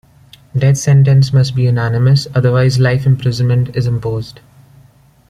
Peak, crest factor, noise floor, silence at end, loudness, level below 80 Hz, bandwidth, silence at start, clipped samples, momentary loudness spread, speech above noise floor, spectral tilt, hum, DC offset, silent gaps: -2 dBFS; 12 dB; -47 dBFS; 1 s; -13 LUFS; -42 dBFS; 11 kHz; 0.55 s; under 0.1%; 9 LU; 35 dB; -6.5 dB/octave; none; under 0.1%; none